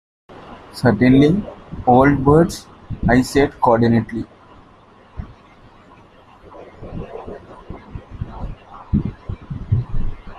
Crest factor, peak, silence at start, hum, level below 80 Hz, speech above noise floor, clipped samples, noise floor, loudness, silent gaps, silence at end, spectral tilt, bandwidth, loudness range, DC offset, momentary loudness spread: 18 dB; -2 dBFS; 0.3 s; none; -34 dBFS; 33 dB; under 0.1%; -47 dBFS; -16 LUFS; none; 0 s; -7.5 dB/octave; 14 kHz; 22 LU; under 0.1%; 25 LU